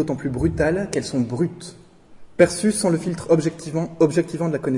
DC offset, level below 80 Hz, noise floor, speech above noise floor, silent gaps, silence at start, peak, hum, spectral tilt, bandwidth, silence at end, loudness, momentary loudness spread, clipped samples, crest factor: under 0.1%; -44 dBFS; -43 dBFS; 22 dB; none; 0 s; -2 dBFS; none; -6 dB/octave; 11.5 kHz; 0 s; -21 LUFS; 8 LU; under 0.1%; 20 dB